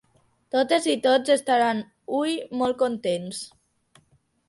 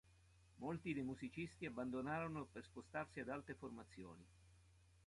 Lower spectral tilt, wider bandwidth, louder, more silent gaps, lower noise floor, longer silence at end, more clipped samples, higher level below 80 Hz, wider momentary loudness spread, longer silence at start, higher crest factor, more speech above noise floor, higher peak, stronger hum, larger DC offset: second, -3.5 dB/octave vs -7 dB/octave; about the same, 11.5 kHz vs 11.5 kHz; first, -24 LUFS vs -49 LUFS; neither; second, -64 dBFS vs -71 dBFS; first, 1 s vs 0 s; neither; about the same, -68 dBFS vs -72 dBFS; second, 10 LU vs 13 LU; first, 0.55 s vs 0.05 s; about the same, 18 dB vs 18 dB; first, 40 dB vs 22 dB; first, -6 dBFS vs -32 dBFS; neither; neither